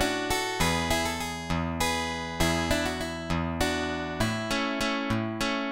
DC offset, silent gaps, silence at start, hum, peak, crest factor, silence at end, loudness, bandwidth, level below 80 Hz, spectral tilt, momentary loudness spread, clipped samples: 0.2%; none; 0 s; none; -10 dBFS; 18 dB; 0 s; -28 LUFS; 17 kHz; -42 dBFS; -4 dB/octave; 5 LU; under 0.1%